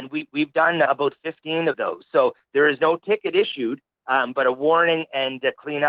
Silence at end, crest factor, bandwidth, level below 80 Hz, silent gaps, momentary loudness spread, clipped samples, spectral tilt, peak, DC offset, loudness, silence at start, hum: 0 s; 16 dB; 5 kHz; -78 dBFS; none; 9 LU; under 0.1%; -8 dB/octave; -6 dBFS; under 0.1%; -21 LUFS; 0 s; none